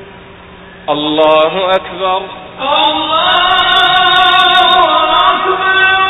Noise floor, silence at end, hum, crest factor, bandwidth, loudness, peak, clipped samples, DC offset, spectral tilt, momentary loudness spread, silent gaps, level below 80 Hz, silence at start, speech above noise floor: -34 dBFS; 0 s; none; 10 dB; 13.5 kHz; -9 LUFS; 0 dBFS; under 0.1%; under 0.1%; -4 dB/octave; 9 LU; none; -44 dBFS; 0 s; 23 dB